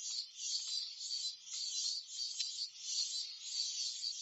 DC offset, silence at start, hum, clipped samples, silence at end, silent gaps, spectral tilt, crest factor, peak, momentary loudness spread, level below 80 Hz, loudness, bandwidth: under 0.1%; 0 s; none; under 0.1%; 0 s; none; 7 dB/octave; 18 dB; -24 dBFS; 4 LU; under -90 dBFS; -38 LUFS; 12.5 kHz